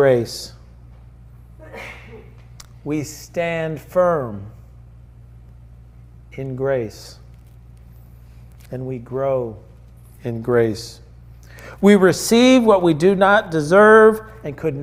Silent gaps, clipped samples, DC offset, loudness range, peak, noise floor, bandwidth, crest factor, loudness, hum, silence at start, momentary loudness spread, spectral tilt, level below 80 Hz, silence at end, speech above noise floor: none; under 0.1%; under 0.1%; 16 LU; -2 dBFS; -43 dBFS; 16 kHz; 18 dB; -16 LUFS; none; 0 s; 23 LU; -5.5 dB/octave; -46 dBFS; 0 s; 27 dB